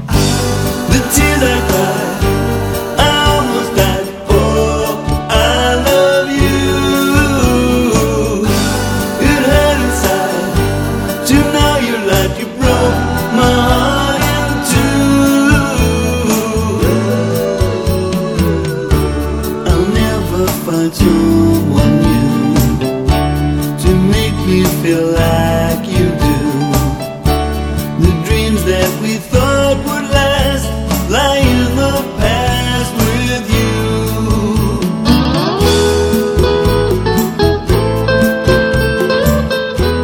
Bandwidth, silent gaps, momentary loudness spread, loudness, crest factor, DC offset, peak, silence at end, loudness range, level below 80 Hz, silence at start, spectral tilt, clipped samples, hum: over 20 kHz; none; 5 LU; -13 LUFS; 12 dB; under 0.1%; 0 dBFS; 0 s; 2 LU; -22 dBFS; 0 s; -5 dB/octave; under 0.1%; none